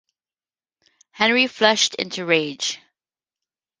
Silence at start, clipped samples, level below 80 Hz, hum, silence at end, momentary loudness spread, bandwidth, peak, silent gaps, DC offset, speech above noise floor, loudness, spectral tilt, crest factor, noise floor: 1.15 s; under 0.1%; -70 dBFS; none; 1.05 s; 10 LU; 10.5 kHz; -2 dBFS; none; under 0.1%; over 70 dB; -19 LUFS; -2 dB/octave; 22 dB; under -90 dBFS